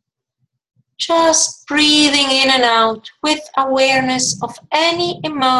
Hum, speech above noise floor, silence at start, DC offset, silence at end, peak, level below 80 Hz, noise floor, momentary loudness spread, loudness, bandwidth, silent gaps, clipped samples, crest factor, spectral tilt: none; 55 dB; 1 s; under 0.1%; 0 s; 0 dBFS; -54 dBFS; -70 dBFS; 9 LU; -14 LUFS; 12.5 kHz; none; under 0.1%; 16 dB; -1.5 dB/octave